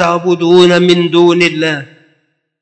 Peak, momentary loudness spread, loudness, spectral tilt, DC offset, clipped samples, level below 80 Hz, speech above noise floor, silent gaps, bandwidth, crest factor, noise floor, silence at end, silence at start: 0 dBFS; 9 LU; -9 LUFS; -5.5 dB/octave; under 0.1%; 0.2%; -56 dBFS; 51 dB; none; 8.6 kHz; 10 dB; -60 dBFS; 0.75 s; 0 s